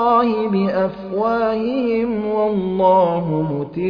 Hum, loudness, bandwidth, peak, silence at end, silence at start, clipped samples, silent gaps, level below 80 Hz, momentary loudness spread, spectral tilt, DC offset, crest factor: none; -18 LUFS; 5.4 kHz; -4 dBFS; 0 s; 0 s; under 0.1%; none; -50 dBFS; 7 LU; -10 dB/octave; under 0.1%; 14 dB